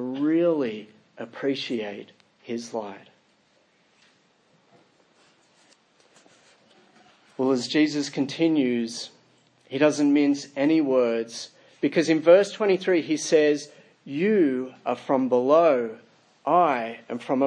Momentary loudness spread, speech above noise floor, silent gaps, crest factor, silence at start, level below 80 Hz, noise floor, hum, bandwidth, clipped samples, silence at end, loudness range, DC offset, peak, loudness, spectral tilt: 16 LU; 41 dB; none; 20 dB; 0 s; -80 dBFS; -64 dBFS; none; 10 kHz; under 0.1%; 0 s; 14 LU; under 0.1%; -4 dBFS; -23 LUFS; -5 dB/octave